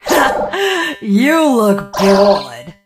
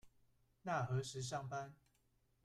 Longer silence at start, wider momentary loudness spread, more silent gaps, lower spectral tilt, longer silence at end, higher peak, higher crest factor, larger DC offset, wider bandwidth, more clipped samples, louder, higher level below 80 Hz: about the same, 0.05 s vs 0.05 s; second, 6 LU vs 11 LU; neither; about the same, -5 dB/octave vs -5 dB/octave; second, 0.15 s vs 0.7 s; first, 0 dBFS vs -28 dBFS; second, 12 dB vs 18 dB; neither; first, 15.5 kHz vs 13 kHz; neither; first, -13 LUFS vs -44 LUFS; first, -46 dBFS vs -72 dBFS